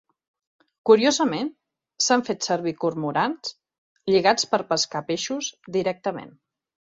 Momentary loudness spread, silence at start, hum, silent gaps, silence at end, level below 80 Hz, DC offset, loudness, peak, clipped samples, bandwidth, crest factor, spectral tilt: 12 LU; 0.85 s; none; 3.78-3.96 s; 0.55 s; -68 dBFS; under 0.1%; -23 LUFS; -4 dBFS; under 0.1%; 7.8 kHz; 20 dB; -3.5 dB/octave